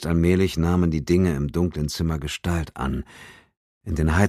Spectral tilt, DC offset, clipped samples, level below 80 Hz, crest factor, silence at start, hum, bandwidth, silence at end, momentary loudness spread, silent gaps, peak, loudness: -6.5 dB/octave; under 0.1%; under 0.1%; -34 dBFS; 18 dB; 0 s; none; 14.5 kHz; 0 s; 10 LU; 3.57-3.81 s; -4 dBFS; -23 LUFS